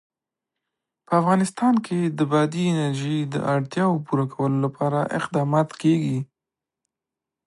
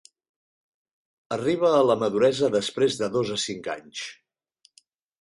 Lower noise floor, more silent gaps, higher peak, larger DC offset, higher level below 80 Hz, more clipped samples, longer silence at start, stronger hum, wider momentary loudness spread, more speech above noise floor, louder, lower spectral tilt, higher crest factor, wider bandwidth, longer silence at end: first, -87 dBFS vs -65 dBFS; neither; first, -4 dBFS vs -8 dBFS; neither; about the same, -68 dBFS vs -66 dBFS; neither; second, 1.1 s vs 1.3 s; neither; second, 5 LU vs 13 LU; first, 66 dB vs 41 dB; about the same, -23 LUFS vs -24 LUFS; first, -7 dB/octave vs -4.5 dB/octave; about the same, 18 dB vs 18 dB; about the same, 11.5 kHz vs 11.5 kHz; about the same, 1.2 s vs 1.1 s